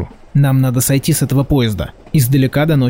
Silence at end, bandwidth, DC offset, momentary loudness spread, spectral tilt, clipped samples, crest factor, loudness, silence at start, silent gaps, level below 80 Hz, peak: 0 s; 16.5 kHz; 0.4%; 6 LU; -6 dB/octave; under 0.1%; 10 dB; -14 LUFS; 0 s; none; -34 dBFS; -4 dBFS